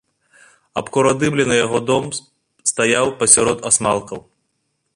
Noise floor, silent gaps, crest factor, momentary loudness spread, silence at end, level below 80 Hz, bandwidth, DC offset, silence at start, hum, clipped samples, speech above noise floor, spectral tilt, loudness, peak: -70 dBFS; none; 18 dB; 16 LU; 0.75 s; -52 dBFS; 14 kHz; under 0.1%; 0.75 s; none; under 0.1%; 53 dB; -3 dB/octave; -16 LUFS; 0 dBFS